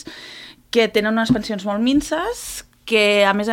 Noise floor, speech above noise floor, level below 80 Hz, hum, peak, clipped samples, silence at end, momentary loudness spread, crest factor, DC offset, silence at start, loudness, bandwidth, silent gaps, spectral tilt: -40 dBFS; 22 dB; -46 dBFS; none; -2 dBFS; under 0.1%; 0 s; 19 LU; 16 dB; under 0.1%; 0.05 s; -18 LUFS; 17 kHz; none; -4 dB/octave